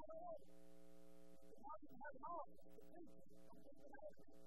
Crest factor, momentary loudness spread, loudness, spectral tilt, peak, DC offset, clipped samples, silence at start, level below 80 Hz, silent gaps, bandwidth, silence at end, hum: 18 dB; 15 LU; -60 LUFS; -6 dB/octave; -40 dBFS; 0.2%; under 0.1%; 0 s; -80 dBFS; none; 16 kHz; 0 s; 60 Hz at -80 dBFS